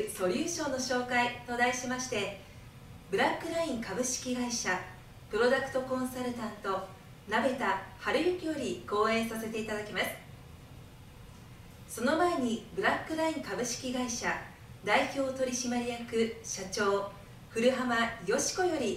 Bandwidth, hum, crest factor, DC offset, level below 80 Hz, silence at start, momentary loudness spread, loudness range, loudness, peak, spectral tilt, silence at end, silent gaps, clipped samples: 16 kHz; none; 20 dB; under 0.1%; -58 dBFS; 0 s; 22 LU; 3 LU; -32 LUFS; -12 dBFS; -3 dB/octave; 0 s; none; under 0.1%